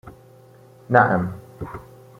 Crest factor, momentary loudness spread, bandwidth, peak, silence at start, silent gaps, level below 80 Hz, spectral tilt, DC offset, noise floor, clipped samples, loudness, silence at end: 22 dB; 19 LU; 15.5 kHz; -2 dBFS; 0.05 s; none; -52 dBFS; -9 dB/octave; under 0.1%; -49 dBFS; under 0.1%; -19 LUFS; 0.4 s